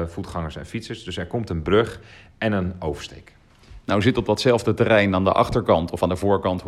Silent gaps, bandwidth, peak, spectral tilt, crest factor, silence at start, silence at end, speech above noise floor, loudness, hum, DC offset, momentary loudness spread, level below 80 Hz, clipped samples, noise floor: none; 14 kHz; -4 dBFS; -6.5 dB/octave; 18 dB; 0 s; 0 s; 25 dB; -22 LUFS; none; under 0.1%; 14 LU; -44 dBFS; under 0.1%; -46 dBFS